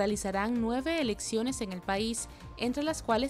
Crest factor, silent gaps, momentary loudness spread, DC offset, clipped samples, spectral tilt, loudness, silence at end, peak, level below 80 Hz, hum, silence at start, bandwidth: 16 dB; none; 5 LU; under 0.1%; under 0.1%; -4 dB/octave; -32 LUFS; 0 s; -16 dBFS; -50 dBFS; none; 0 s; 15 kHz